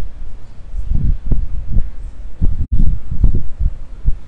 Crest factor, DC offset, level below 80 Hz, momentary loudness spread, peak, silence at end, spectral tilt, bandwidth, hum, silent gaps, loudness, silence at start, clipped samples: 12 dB; under 0.1%; -16 dBFS; 15 LU; 0 dBFS; 0 s; -10 dB/octave; 1.4 kHz; none; none; -22 LUFS; 0 s; under 0.1%